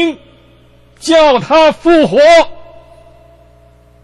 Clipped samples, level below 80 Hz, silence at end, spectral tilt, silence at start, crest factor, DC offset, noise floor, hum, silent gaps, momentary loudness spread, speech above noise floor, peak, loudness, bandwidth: under 0.1%; -40 dBFS; 1.4 s; -4.5 dB/octave; 0 s; 12 dB; under 0.1%; -44 dBFS; 60 Hz at -45 dBFS; none; 14 LU; 36 dB; 0 dBFS; -9 LUFS; 11.5 kHz